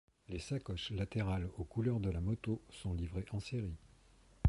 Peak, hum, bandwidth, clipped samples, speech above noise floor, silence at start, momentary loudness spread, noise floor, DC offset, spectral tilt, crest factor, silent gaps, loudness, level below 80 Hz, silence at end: -18 dBFS; none; 11.5 kHz; under 0.1%; 26 dB; 0.3 s; 7 LU; -65 dBFS; under 0.1%; -7 dB/octave; 22 dB; none; -40 LUFS; -48 dBFS; 0 s